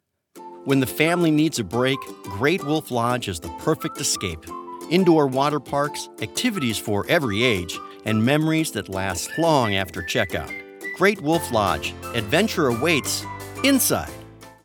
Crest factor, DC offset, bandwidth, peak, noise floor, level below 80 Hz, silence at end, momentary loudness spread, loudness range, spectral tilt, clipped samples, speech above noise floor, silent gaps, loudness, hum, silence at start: 20 dB; under 0.1%; 19 kHz; -2 dBFS; -44 dBFS; -52 dBFS; 0.1 s; 11 LU; 1 LU; -4.5 dB/octave; under 0.1%; 22 dB; none; -22 LUFS; none; 0.35 s